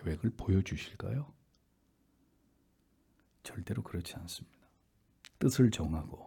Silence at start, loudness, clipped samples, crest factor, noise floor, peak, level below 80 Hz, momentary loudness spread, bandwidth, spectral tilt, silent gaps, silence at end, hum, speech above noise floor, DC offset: 0 s; -34 LUFS; under 0.1%; 22 dB; -72 dBFS; -14 dBFS; -54 dBFS; 18 LU; 18 kHz; -6.5 dB/octave; none; 0 s; none; 39 dB; under 0.1%